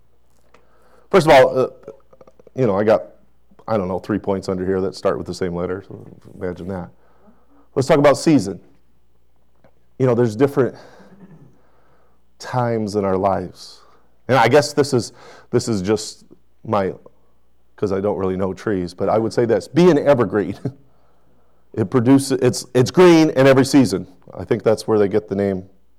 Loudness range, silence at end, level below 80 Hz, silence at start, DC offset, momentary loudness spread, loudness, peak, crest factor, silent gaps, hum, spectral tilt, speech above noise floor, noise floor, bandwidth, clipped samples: 8 LU; 0.35 s; -52 dBFS; 1.1 s; 0.4%; 18 LU; -18 LUFS; -6 dBFS; 14 dB; none; none; -6 dB/octave; 45 dB; -62 dBFS; 15.5 kHz; under 0.1%